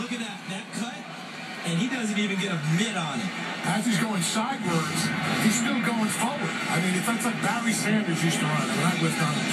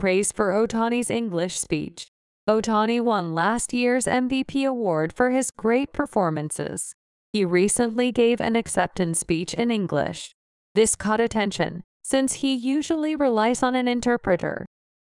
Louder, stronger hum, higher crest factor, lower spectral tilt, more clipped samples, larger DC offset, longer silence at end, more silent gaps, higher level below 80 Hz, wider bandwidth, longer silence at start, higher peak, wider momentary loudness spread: second, -26 LUFS vs -23 LUFS; neither; about the same, 16 dB vs 16 dB; about the same, -4 dB/octave vs -4.5 dB/octave; neither; neither; second, 0 s vs 0.45 s; second, none vs 2.08-2.47 s, 6.94-7.33 s, 10.34-10.75 s, 11.84-12.00 s; second, -74 dBFS vs -52 dBFS; first, 15 kHz vs 12 kHz; about the same, 0 s vs 0 s; second, -10 dBFS vs -6 dBFS; about the same, 9 LU vs 9 LU